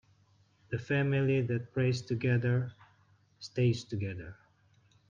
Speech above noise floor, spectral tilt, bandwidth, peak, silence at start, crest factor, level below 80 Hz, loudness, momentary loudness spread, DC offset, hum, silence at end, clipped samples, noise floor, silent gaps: 36 dB; -7.5 dB/octave; 7.4 kHz; -18 dBFS; 0.7 s; 16 dB; -66 dBFS; -32 LUFS; 13 LU; under 0.1%; none; 0.75 s; under 0.1%; -67 dBFS; none